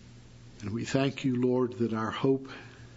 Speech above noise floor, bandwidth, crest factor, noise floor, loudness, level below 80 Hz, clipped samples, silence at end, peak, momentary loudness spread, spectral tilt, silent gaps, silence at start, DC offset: 21 dB; 8 kHz; 20 dB; -51 dBFS; -30 LUFS; -60 dBFS; under 0.1%; 0 s; -10 dBFS; 14 LU; -6.5 dB/octave; none; 0 s; under 0.1%